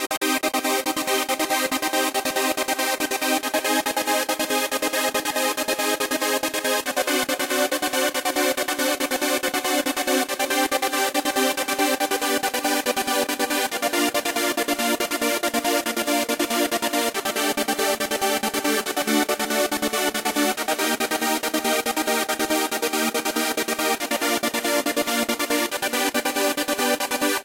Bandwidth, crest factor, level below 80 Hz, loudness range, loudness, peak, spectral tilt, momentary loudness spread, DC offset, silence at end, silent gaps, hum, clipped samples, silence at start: 17 kHz; 16 dB; -62 dBFS; 1 LU; -22 LUFS; -8 dBFS; -1 dB/octave; 1 LU; under 0.1%; 0 s; 0.17-0.21 s; none; under 0.1%; 0 s